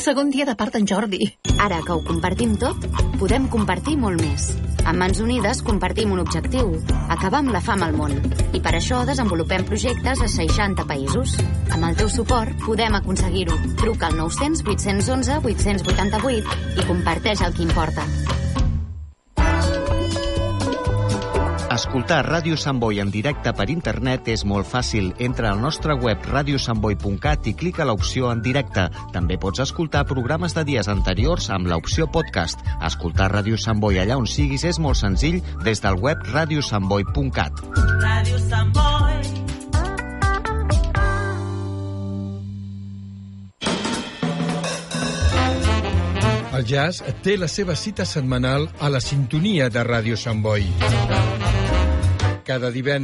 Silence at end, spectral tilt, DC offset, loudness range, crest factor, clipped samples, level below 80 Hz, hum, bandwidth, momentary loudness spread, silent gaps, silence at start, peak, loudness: 0 s; -5.5 dB/octave; under 0.1%; 2 LU; 16 dB; under 0.1%; -28 dBFS; none; 11.5 kHz; 5 LU; none; 0 s; -4 dBFS; -21 LUFS